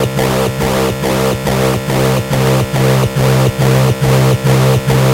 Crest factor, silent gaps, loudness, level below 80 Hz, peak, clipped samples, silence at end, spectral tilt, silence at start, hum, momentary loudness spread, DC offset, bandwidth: 10 dB; none; -12 LUFS; -30 dBFS; 0 dBFS; under 0.1%; 0 s; -6 dB/octave; 0 s; none; 3 LU; under 0.1%; 16 kHz